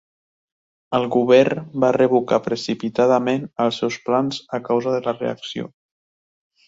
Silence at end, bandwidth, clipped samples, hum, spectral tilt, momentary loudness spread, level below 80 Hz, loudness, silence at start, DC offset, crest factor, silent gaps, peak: 1 s; 7.8 kHz; under 0.1%; none; -6 dB/octave; 11 LU; -62 dBFS; -20 LUFS; 0.9 s; under 0.1%; 18 dB; none; -2 dBFS